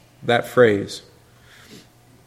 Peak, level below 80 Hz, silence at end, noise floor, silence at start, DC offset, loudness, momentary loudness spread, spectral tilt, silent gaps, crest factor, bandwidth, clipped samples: 0 dBFS; -60 dBFS; 1.25 s; -50 dBFS; 0.25 s; under 0.1%; -18 LUFS; 17 LU; -5.5 dB/octave; none; 22 dB; 15.5 kHz; under 0.1%